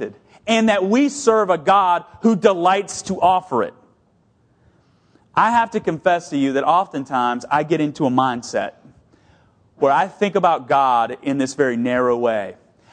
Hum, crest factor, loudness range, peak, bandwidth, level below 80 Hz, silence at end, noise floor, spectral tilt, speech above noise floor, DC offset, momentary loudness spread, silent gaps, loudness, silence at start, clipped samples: none; 18 dB; 4 LU; 0 dBFS; 10 kHz; -60 dBFS; 0.4 s; -59 dBFS; -5 dB/octave; 42 dB; under 0.1%; 8 LU; none; -18 LUFS; 0 s; under 0.1%